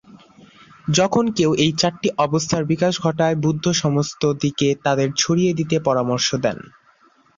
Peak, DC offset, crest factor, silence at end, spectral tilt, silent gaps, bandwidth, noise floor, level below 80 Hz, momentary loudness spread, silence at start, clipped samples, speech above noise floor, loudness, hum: -2 dBFS; under 0.1%; 18 dB; 0.8 s; -5 dB/octave; none; 7.6 kHz; -55 dBFS; -54 dBFS; 4 LU; 0.15 s; under 0.1%; 36 dB; -19 LUFS; none